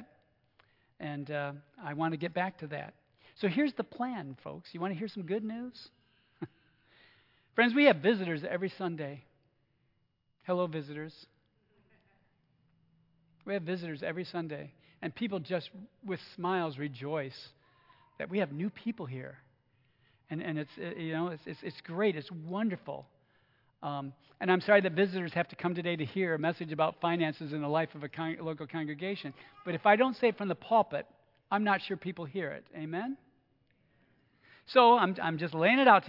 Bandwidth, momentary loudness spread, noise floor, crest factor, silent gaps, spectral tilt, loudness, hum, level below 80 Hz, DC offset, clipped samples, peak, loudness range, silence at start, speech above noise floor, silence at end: 5.8 kHz; 19 LU; -76 dBFS; 26 dB; none; -8.5 dB/octave; -32 LUFS; none; -80 dBFS; under 0.1%; under 0.1%; -8 dBFS; 10 LU; 0 s; 44 dB; 0 s